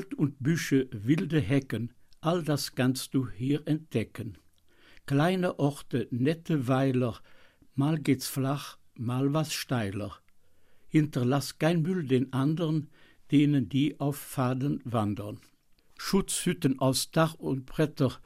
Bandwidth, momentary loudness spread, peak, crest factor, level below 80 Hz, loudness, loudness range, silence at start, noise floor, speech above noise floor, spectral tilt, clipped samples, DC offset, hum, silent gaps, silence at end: 15.5 kHz; 10 LU; -12 dBFS; 16 dB; -58 dBFS; -29 LUFS; 3 LU; 0 s; -59 dBFS; 31 dB; -6 dB/octave; under 0.1%; under 0.1%; none; none; 0.05 s